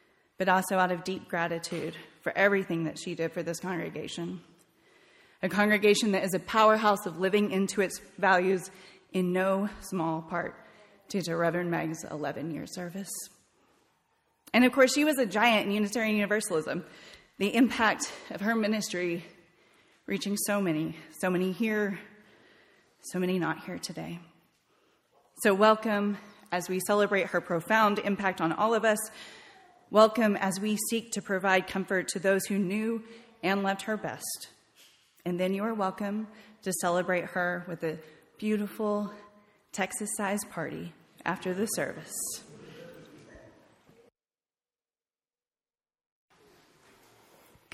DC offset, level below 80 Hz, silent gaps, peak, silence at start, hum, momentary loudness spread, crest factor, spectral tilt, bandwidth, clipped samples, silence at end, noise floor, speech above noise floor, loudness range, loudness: under 0.1%; -68 dBFS; none; -8 dBFS; 0.4 s; none; 14 LU; 22 dB; -4.5 dB/octave; 16 kHz; under 0.1%; 4.35 s; under -90 dBFS; over 61 dB; 8 LU; -29 LUFS